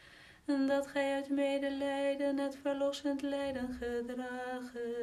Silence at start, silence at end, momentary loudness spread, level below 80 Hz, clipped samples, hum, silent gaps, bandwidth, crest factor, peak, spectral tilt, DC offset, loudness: 0 s; 0 s; 8 LU; -64 dBFS; under 0.1%; none; none; 13.5 kHz; 14 dB; -22 dBFS; -4.5 dB/octave; under 0.1%; -36 LUFS